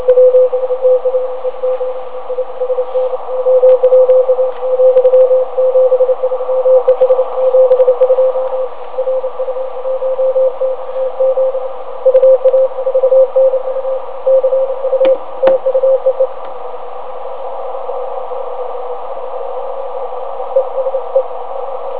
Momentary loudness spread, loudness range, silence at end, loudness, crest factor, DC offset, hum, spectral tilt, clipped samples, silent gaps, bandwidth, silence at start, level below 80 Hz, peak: 14 LU; 10 LU; 0 s; -13 LUFS; 14 dB; 7%; none; -8 dB/octave; under 0.1%; none; 4 kHz; 0 s; -66 dBFS; 0 dBFS